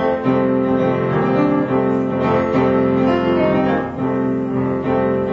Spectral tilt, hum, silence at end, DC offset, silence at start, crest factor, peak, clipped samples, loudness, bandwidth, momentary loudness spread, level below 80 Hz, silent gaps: -9 dB/octave; none; 0 s; under 0.1%; 0 s; 12 dB; -4 dBFS; under 0.1%; -17 LUFS; 6.6 kHz; 4 LU; -46 dBFS; none